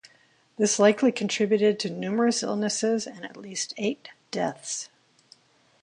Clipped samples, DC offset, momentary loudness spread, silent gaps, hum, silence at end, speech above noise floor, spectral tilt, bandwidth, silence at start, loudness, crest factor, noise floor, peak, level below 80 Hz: under 0.1%; under 0.1%; 15 LU; none; none; 0.95 s; 36 dB; -3.5 dB/octave; 11 kHz; 0.6 s; -25 LUFS; 20 dB; -61 dBFS; -8 dBFS; -74 dBFS